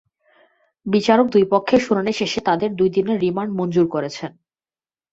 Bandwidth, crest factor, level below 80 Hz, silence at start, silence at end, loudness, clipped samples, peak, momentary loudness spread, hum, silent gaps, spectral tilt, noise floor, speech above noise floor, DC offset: 8 kHz; 18 dB; -58 dBFS; 0.85 s; 0.85 s; -19 LUFS; under 0.1%; -2 dBFS; 11 LU; none; none; -6 dB/octave; under -90 dBFS; over 72 dB; under 0.1%